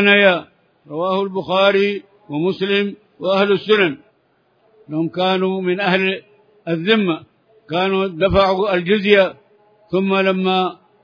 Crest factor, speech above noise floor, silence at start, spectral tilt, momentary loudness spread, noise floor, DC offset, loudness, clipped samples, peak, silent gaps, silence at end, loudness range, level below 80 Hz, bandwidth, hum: 18 dB; 44 dB; 0 s; -7 dB/octave; 11 LU; -60 dBFS; under 0.1%; -17 LUFS; under 0.1%; 0 dBFS; none; 0.3 s; 3 LU; -46 dBFS; 5.2 kHz; none